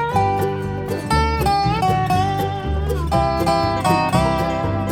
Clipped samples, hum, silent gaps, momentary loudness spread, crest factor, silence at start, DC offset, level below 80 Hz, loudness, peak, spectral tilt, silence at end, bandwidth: under 0.1%; none; none; 5 LU; 14 dB; 0 s; under 0.1%; -30 dBFS; -19 LUFS; -4 dBFS; -6 dB/octave; 0 s; 18.5 kHz